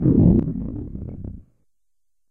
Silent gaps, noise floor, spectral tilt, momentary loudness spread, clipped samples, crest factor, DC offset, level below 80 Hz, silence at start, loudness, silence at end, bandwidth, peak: none; -82 dBFS; -14.5 dB/octave; 20 LU; under 0.1%; 18 dB; under 0.1%; -32 dBFS; 0 s; -19 LUFS; 0.9 s; 2.1 kHz; -2 dBFS